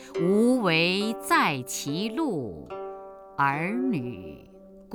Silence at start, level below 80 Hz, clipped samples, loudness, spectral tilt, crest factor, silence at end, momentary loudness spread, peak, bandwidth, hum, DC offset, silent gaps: 0 s; -60 dBFS; under 0.1%; -25 LUFS; -4.5 dB/octave; 16 dB; 0 s; 17 LU; -10 dBFS; over 20 kHz; none; under 0.1%; none